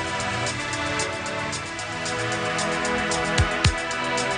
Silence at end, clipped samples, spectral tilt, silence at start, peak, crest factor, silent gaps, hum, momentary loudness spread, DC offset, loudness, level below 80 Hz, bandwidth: 0 s; under 0.1%; -3.5 dB/octave; 0 s; -2 dBFS; 24 dB; none; none; 6 LU; under 0.1%; -24 LUFS; -40 dBFS; 10 kHz